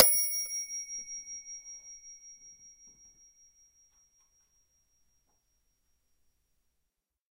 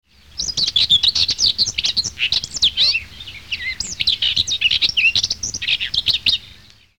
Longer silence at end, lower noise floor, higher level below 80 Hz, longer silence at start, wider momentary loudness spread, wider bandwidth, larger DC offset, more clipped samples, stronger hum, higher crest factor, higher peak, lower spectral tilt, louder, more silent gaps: first, 4.65 s vs 0.5 s; first, -83 dBFS vs -46 dBFS; second, -72 dBFS vs -44 dBFS; second, 0 s vs 0.35 s; first, 25 LU vs 11 LU; second, 16 kHz vs 19 kHz; second, under 0.1% vs 0.4%; neither; neither; first, 36 dB vs 16 dB; first, 0 dBFS vs -4 dBFS; about the same, 2 dB/octave vs 1 dB/octave; second, -31 LUFS vs -16 LUFS; neither